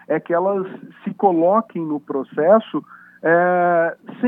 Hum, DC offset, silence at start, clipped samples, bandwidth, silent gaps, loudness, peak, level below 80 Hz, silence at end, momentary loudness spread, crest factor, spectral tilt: none; under 0.1%; 0.1 s; under 0.1%; 3.8 kHz; none; -19 LUFS; -2 dBFS; -78 dBFS; 0 s; 13 LU; 16 dB; -10 dB/octave